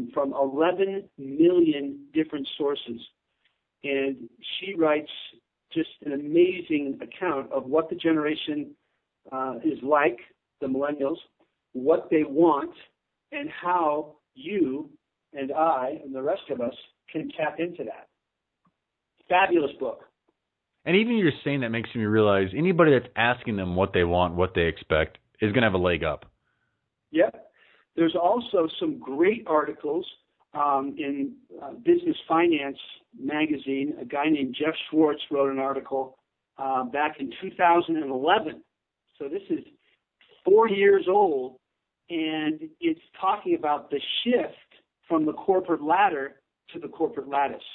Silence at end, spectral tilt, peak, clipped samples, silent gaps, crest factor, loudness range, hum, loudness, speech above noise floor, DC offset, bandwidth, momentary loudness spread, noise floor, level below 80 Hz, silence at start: 0 s; -10 dB/octave; -6 dBFS; under 0.1%; none; 20 dB; 6 LU; none; -25 LUFS; 58 dB; under 0.1%; 4.2 kHz; 15 LU; -83 dBFS; -56 dBFS; 0 s